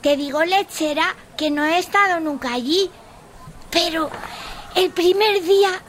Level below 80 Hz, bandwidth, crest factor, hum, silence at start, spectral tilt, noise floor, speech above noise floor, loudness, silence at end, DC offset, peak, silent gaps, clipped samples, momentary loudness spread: -48 dBFS; 16 kHz; 16 dB; none; 0.05 s; -2.5 dB/octave; -41 dBFS; 22 dB; -19 LUFS; 0.05 s; under 0.1%; -4 dBFS; none; under 0.1%; 9 LU